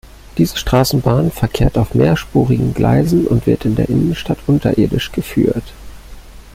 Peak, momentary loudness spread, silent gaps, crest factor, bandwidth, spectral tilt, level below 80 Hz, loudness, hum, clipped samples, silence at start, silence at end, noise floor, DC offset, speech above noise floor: 0 dBFS; 4 LU; none; 14 dB; 16.5 kHz; -7 dB/octave; -30 dBFS; -15 LUFS; none; under 0.1%; 0.35 s; 0.05 s; -35 dBFS; under 0.1%; 21 dB